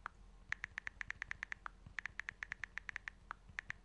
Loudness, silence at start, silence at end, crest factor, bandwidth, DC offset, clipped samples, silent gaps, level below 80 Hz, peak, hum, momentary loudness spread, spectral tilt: -48 LUFS; 0 s; 0 s; 28 dB; 11 kHz; under 0.1%; under 0.1%; none; -64 dBFS; -22 dBFS; none; 5 LU; -2 dB/octave